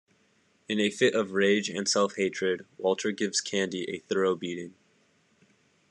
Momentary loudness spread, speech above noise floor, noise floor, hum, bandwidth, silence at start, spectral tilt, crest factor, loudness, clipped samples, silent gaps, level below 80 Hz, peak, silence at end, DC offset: 8 LU; 39 dB; -67 dBFS; none; 11 kHz; 0.7 s; -3.5 dB/octave; 20 dB; -28 LUFS; under 0.1%; none; -78 dBFS; -10 dBFS; 1.2 s; under 0.1%